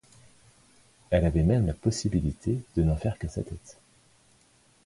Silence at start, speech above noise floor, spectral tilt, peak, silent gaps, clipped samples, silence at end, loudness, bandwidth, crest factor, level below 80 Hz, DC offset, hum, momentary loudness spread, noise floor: 1.1 s; 36 dB; -7 dB/octave; -10 dBFS; none; under 0.1%; 1.15 s; -28 LUFS; 11.5 kHz; 20 dB; -38 dBFS; under 0.1%; none; 12 LU; -62 dBFS